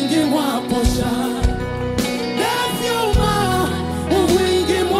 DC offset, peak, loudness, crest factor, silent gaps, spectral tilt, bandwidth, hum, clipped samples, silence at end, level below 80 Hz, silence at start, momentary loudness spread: under 0.1%; -4 dBFS; -19 LUFS; 14 dB; none; -5 dB/octave; 16 kHz; none; under 0.1%; 0 s; -28 dBFS; 0 s; 5 LU